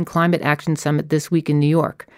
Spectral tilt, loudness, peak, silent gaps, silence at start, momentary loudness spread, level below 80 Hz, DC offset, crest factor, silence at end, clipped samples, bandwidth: -6.5 dB/octave; -19 LUFS; -2 dBFS; none; 0 s; 3 LU; -58 dBFS; under 0.1%; 16 dB; 0.25 s; under 0.1%; 15.5 kHz